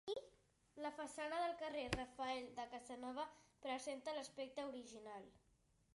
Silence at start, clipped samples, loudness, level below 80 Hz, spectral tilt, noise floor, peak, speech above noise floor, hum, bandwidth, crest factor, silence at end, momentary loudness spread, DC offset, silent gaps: 0.05 s; under 0.1%; -48 LUFS; -70 dBFS; -4 dB/octave; -74 dBFS; -24 dBFS; 26 dB; none; 11.5 kHz; 26 dB; 0.6 s; 11 LU; under 0.1%; none